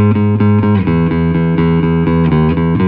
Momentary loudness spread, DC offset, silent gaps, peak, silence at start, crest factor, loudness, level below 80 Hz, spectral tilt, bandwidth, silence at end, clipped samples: 2 LU; under 0.1%; none; -2 dBFS; 0 s; 10 dB; -12 LUFS; -28 dBFS; -12 dB/octave; 4.5 kHz; 0 s; under 0.1%